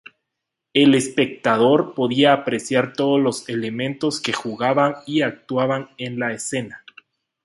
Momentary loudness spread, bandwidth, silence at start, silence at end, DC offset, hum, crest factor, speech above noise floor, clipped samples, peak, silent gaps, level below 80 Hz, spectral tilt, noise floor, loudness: 10 LU; 11.5 kHz; 0.75 s; 0.7 s; under 0.1%; none; 18 dB; 62 dB; under 0.1%; -2 dBFS; none; -66 dBFS; -4.5 dB/octave; -81 dBFS; -20 LUFS